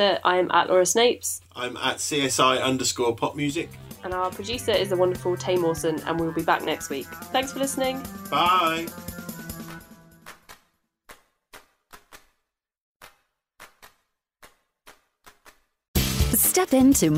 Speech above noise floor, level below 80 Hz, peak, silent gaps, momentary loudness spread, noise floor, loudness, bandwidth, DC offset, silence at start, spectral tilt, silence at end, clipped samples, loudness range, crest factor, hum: 55 dB; -42 dBFS; -6 dBFS; 12.81-13.00 s, 15.88-15.94 s; 17 LU; -78 dBFS; -23 LUFS; 16 kHz; under 0.1%; 0 s; -3.5 dB/octave; 0 s; under 0.1%; 12 LU; 20 dB; none